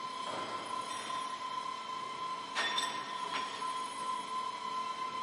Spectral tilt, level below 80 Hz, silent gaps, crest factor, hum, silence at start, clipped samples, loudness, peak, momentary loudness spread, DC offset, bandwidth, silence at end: -1 dB/octave; -84 dBFS; none; 20 dB; none; 0 s; under 0.1%; -38 LUFS; -20 dBFS; 6 LU; under 0.1%; 11.5 kHz; 0 s